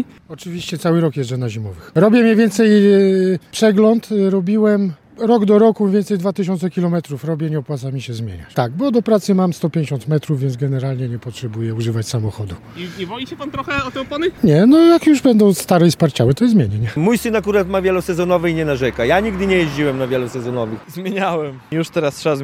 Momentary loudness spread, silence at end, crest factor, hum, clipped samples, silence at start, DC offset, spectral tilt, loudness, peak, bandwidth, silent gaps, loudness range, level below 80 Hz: 14 LU; 0 s; 16 dB; none; under 0.1%; 0 s; under 0.1%; -6.5 dB/octave; -16 LUFS; 0 dBFS; 16 kHz; none; 8 LU; -46 dBFS